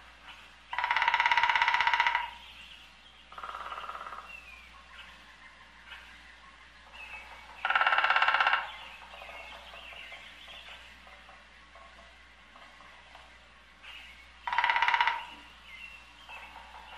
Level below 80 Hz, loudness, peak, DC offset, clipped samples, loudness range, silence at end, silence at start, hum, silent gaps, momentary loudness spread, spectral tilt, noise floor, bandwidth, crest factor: -62 dBFS; -28 LUFS; -10 dBFS; under 0.1%; under 0.1%; 20 LU; 0 s; 0.05 s; none; none; 27 LU; -1 dB/octave; -56 dBFS; 13 kHz; 24 dB